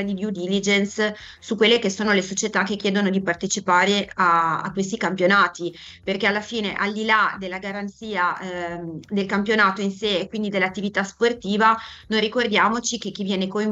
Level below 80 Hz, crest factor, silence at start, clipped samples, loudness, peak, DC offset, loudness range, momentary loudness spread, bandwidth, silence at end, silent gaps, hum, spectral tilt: -58 dBFS; 18 dB; 0 s; under 0.1%; -21 LUFS; -4 dBFS; under 0.1%; 3 LU; 11 LU; 8.2 kHz; 0 s; none; none; -4 dB/octave